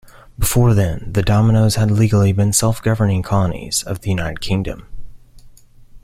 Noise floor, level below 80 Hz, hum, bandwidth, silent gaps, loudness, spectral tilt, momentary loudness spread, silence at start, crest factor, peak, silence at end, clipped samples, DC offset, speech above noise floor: -42 dBFS; -32 dBFS; none; 16 kHz; none; -17 LUFS; -5.5 dB/octave; 8 LU; 0.4 s; 14 dB; -2 dBFS; 0.05 s; under 0.1%; under 0.1%; 26 dB